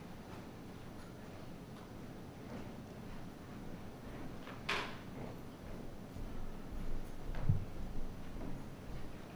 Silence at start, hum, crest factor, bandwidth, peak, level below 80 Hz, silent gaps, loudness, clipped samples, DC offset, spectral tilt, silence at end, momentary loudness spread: 0 s; none; 24 dB; over 20 kHz; -18 dBFS; -46 dBFS; none; -47 LUFS; under 0.1%; under 0.1%; -6 dB/octave; 0 s; 12 LU